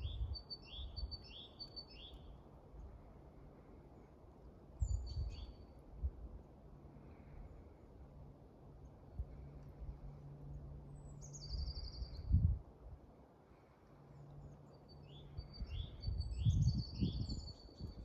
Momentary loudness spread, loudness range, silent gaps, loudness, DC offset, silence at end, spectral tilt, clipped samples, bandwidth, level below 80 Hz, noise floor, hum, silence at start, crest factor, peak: 21 LU; 13 LU; none; -45 LUFS; under 0.1%; 0 s; -6.5 dB/octave; under 0.1%; 8.4 kHz; -50 dBFS; -65 dBFS; none; 0 s; 24 dB; -22 dBFS